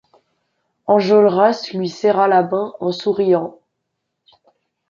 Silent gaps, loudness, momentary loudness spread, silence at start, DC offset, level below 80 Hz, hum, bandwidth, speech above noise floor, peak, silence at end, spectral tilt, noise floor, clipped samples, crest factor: none; -16 LUFS; 10 LU; 0.9 s; under 0.1%; -66 dBFS; none; 7.4 kHz; 60 dB; -2 dBFS; 1.4 s; -6.5 dB/octave; -76 dBFS; under 0.1%; 16 dB